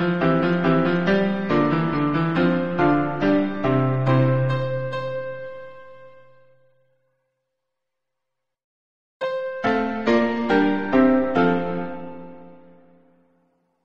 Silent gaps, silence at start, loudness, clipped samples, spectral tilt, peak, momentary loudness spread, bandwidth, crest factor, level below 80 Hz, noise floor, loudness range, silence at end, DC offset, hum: 8.64-9.20 s; 0 s; -21 LUFS; under 0.1%; -8.5 dB/octave; -6 dBFS; 14 LU; 7 kHz; 16 dB; -52 dBFS; -83 dBFS; 14 LU; 0 s; 0.8%; none